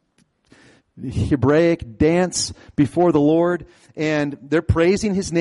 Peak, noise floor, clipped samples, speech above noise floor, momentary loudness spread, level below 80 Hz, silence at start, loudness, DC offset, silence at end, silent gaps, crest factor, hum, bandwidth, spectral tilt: -6 dBFS; -62 dBFS; under 0.1%; 44 dB; 9 LU; -40 dBFS; 0.95 s; -19 LUFS; under 0.1%; 0 s; none; 14 dB; none; 11.5 kHz; -6 dB/octave